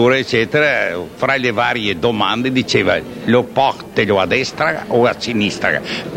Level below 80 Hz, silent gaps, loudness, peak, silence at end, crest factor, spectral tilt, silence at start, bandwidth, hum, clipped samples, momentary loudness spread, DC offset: -48 dBFS; none; -16 LUFS; 0 dBFS; 0 s; 16 dB; -5 dB/octave; 0 s; 16 kHz; none; under 0.1%; 4 LU; under 0.1%